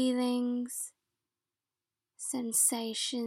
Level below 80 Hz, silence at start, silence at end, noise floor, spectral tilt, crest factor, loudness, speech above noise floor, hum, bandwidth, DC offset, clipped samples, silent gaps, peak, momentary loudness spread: under -90 dBFS; 0 s; 0 s; under -90 dBFS; -1.5 dB/octave; 20 dB; -31 LUFS; over 59 dB; none; 17.5 kHz; under 0.1%; under 0.1%; none; -14 dBFS; 13 LU